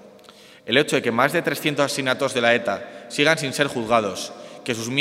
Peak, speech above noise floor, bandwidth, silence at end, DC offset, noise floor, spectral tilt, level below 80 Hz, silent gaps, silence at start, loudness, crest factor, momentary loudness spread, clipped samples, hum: 0 dBFS; 26 dB; 16 kHz; 0 s; under 0.1%; -47 dBFS; -3.5 dB/octave; -66 dBFS; none; 0.05 s; -21 LUFS; 22 dB; 12 LU; under 0.1%; none